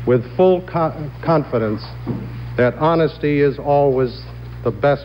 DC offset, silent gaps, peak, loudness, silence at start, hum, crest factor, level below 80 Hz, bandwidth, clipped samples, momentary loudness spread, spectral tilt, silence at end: under 0.1%; none; -4 dBFS; -18 LUFS; 0 s; none; 14 dB; -40 dBFS; 16.5 kHz; under 0.1%; 11 LU; -9.5 dB/octave; 0 s